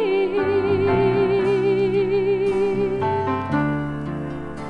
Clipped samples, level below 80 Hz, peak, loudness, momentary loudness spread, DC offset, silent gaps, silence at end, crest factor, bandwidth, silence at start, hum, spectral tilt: under 0.1%; -46 dBFS; -8 dBFS; -21 LUFS; 9 LU; under 0.1%; none; 0 s; 12 dB; 5.4 kHz; 0 s; none; -8 dB/octave